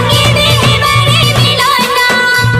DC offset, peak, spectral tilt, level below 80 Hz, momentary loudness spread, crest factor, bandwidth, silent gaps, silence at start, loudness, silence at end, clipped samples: under 0.1%; 0 dBFS; -3.5 dB/octave; -28 dBFS; 1 LU; 8 dB; 15.5 kHz; none; 0 s; -8 LUFS; 0 s; under 0.1%